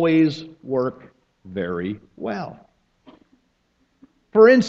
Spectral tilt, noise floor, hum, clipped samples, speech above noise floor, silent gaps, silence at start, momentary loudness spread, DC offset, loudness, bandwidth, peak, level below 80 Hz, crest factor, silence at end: -7 dB/octave; -66 dBFS; none; under 0.1%; 47 dB; none; 0 s; 18 LU; under 0.1%; -22 LUFS; 7.2 kHz; -2 dBFS; -62 dBFS; 20 dB; 0 s